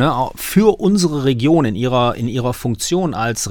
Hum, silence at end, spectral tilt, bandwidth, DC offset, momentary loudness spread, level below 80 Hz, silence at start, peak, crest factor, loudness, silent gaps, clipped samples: none; 0 s; -5.5 dB/octave; 19 kHz; under 0.1%; 6 LU; -40 dBFS; 0 s; 0 dBFS; 16 dB; -16 LUFS; none; under 0.1%